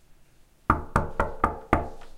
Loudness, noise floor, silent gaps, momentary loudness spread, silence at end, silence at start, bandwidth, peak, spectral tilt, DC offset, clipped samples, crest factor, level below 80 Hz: -27 LUFS; -56 dBFS; none; 5 LU; 0 s; 0.1 s; 16 kHz; -2 dBFS; -7.5 dB/octave; under 0.1%; under 0.1%; 26 dB; -38 dBFS